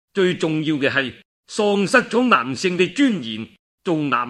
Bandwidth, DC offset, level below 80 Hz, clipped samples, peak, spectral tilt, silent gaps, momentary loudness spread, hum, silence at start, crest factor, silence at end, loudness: 12 kHz; under 0.1%; -64 dBFS; under 0.1%; 0 dBFS; -5 dB/octave; 1.25-1.43 s, 3.59-3.78 s; 13 LU; none; 0.15 s; 20 dB; 0 s; -19 LUFS